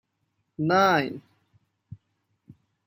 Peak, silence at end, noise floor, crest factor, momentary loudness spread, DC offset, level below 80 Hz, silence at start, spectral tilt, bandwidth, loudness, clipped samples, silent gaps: -8 dBFS; 0.9 s; -76 dBFS; 22 dB; 23 LU; under 0.1%; -70 dBFS; 0.6 s; -6 dB/octave; 16 kHz; -23 LUFS; under 0.1%; none